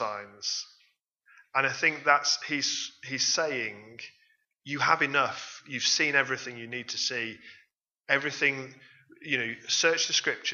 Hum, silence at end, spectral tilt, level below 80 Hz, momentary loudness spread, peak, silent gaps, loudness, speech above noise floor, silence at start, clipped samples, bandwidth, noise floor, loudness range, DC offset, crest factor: none; 0 s; -1 dB/octave; -82 dBFS; 15 LU; -6 dBFS; none; -27 LUFS; 40 dB; 0 s; under 0.1%; 7.6 kHz; -69 dBFS; 2 LU; under 0.1%; 24 dB